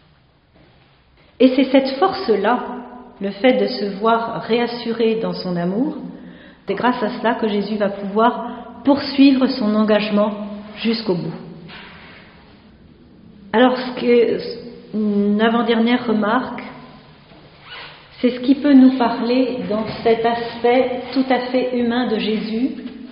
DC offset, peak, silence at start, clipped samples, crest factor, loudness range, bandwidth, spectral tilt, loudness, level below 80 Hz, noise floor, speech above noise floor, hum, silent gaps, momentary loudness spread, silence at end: under 0.1%; 0 dBFS; 1.4 s; under 0.1%; 18 dB; 4 LU; 5.4 kHz; -4 dB/octave; -18 LUFS; -56 dBFS; -54 dBFS; 37 dB; none; none; 17 LU; 0 s